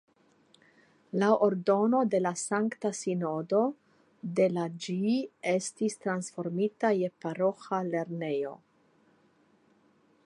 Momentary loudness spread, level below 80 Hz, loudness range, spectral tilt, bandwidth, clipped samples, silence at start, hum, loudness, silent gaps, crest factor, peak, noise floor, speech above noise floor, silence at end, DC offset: 8 LU; -82 dBFS; 4 LU; -5.5 dB/octave; 11.5 kHz; under 0.1%; 1.15 s; none; -30 LUFS; none; 20 dB; -10 dBFS; -66 dBFS; 37 dB; 1.7 s; under 0.1%